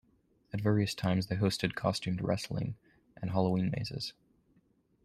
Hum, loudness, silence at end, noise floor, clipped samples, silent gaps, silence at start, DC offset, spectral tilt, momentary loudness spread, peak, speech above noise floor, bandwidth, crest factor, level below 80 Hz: none; -33 LUFS; 0.95 s; -70 dBFS; under 0.1%; none; 0.55 s; under 0.1%; -6 dB/octave; 11 LU; -14 dBFS; 38 dB; 13.5 kHz; 20 dB; -60 dBFS